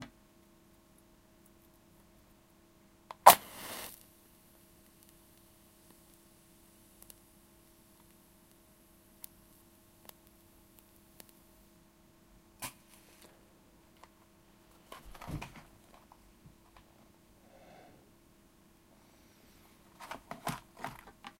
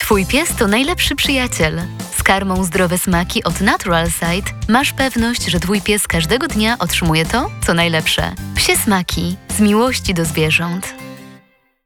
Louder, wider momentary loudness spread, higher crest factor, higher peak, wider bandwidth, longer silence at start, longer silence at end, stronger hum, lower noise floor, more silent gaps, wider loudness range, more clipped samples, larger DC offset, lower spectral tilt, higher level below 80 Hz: second, -31 LUFS vs -15 LUFS; first, 33 LU vs 6 LU; first, 38 dB vs 16 dB; about the same, -2 dBFS vs 0 dBFS; second, 16.5 kHz vs 19.5 kHz; about the same, 0 s vs 0 s; about the same, 0.5 s vs 0.5 s; neither; first, -64 dBFS vs -50 dBFS; neither; first, 27 LU vs 1 LU; neither; neither; second, -2 dB/octave vs -4 dB/octave; second, -66 dBFS vs -30 dBFS